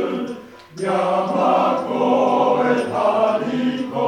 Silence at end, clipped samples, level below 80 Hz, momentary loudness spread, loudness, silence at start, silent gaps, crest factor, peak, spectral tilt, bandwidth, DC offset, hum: 0 s; under 0.1%; -66 dBFS; 11 LU; -19 LUFS; 0 s; none; 14 dB; -4 dBFS; -6 dB/octave; 9.8 kHz; under 0.1%; none